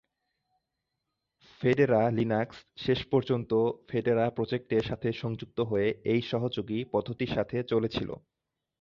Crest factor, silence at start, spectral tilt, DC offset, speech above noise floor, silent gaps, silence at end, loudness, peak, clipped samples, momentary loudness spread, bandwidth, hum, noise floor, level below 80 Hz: 18 dB; 1.6 s; -8 dB/octave; under 0.1%; 55 dB; none; 0.65 s; -29 LUFS; -12 dBFS; under 0.1%; 8 LU; 7.2 kHz; none; -84 dBFS; -58 dBFS